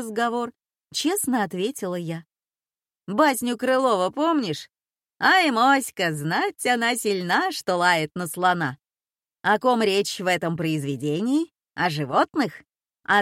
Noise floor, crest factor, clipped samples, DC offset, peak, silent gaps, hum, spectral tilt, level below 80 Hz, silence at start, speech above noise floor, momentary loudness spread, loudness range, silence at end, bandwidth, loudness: under -90 dBFS; 18 dB; under 0.1%; under 0.1%; -6 dBFS; none; none; -4 dB/octave; -70 dBFS; 0 s; over 67 dB; 10 LU; 4 LU; 0 s; 16.5 kHz; -23 LUFS